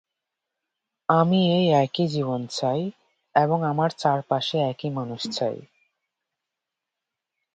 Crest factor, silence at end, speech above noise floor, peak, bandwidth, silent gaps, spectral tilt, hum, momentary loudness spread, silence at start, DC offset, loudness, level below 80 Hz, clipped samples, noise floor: 20 dB; 1.95 s; 63 dB; -4 dBFS; 9 kHz; none; -6.5 dB/octave; none; 10 LU; 1.1 s; under 0.1%; -24 LUFS; -68 dBFS; under 0.1%; -85 dBFS